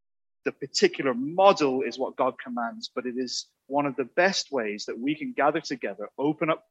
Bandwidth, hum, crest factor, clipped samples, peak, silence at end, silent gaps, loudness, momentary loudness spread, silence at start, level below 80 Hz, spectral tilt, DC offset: 8.6 kHz; none; 24 dB; under 0.1%; -4 dBFS; 0.1 s; none; -27 LUFS; 12 LU; 0.45 s; -78 dBFS; -4 dB/octave; under 0.1%